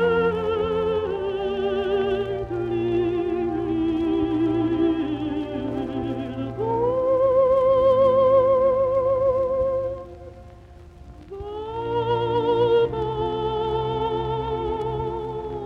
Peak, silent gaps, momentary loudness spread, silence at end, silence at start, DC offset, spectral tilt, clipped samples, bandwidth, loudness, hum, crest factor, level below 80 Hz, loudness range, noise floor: -8 dBFS; none; 11 LU; 0 s; 0 s; under 0.1%; -8.5 dB/octave; under 0.1%; 5.8 kHz; -23 LUFS; none; 14 dB; -44 dBFS; 6 LU; -44 dBFS